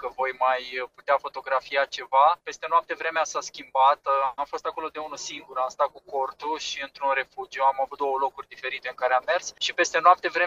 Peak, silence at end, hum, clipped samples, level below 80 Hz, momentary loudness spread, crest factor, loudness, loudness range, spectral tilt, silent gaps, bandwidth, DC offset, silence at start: -4 dBFS; 0 s; none; under 0.1%; -68 dBFS; 12 LU; 22 dB; -25 LUFS; 4 LU; -0.5 dB/octave; none; 8.2 kHz; under 0.1%; 0 s